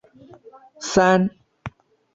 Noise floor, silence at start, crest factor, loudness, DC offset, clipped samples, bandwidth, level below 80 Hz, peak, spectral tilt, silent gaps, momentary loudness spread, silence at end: -47 dBFS; 0.8 s; 20 dB; -19 LUFS; under 0.1%; under 0.1%; 8 kHz; -54 dBFS; -4 dBFS; -5 dB/octave; none; 23 LU; 0.45 s